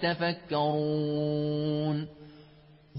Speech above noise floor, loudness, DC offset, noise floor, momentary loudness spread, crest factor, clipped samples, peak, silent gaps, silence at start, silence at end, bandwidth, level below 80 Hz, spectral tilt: 27 dB; -30 LUFS; under 0.1%; -56 dBFS; 4 LU; 14 dB; under 0.1%; -16 dBFS; none; 0 s; 0 s; 5.6 kHz; -64 dBFS; -10.5 dB/octave